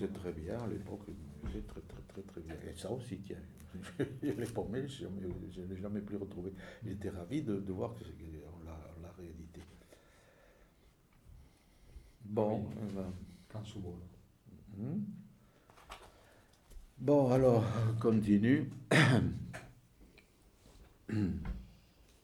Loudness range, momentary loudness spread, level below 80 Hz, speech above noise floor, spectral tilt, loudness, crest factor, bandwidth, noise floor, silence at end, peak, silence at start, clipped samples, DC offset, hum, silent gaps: 17 LU; 22 LU; -56 dBFS; 30 dB; -7 dB/octave; -36 LUFS; 24 dB; 14.5 kHz; -66 dBFS; 0.5 s; -14 dBFS; 0 s; under 0.1%; under 0.1%; none; none